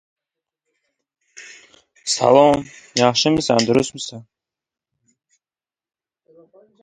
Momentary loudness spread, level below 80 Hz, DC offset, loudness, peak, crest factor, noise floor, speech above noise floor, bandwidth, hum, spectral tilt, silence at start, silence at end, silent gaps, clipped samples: 18 LU; -56 dBFS; under 0.1%; -17 LUFS; 0 dBFS; 22 dB; under -90 dBFS; over 73 dB; 11 kHz; none; -4 dB/octave; 1.4 s; 2.6 s; none; under 0.1%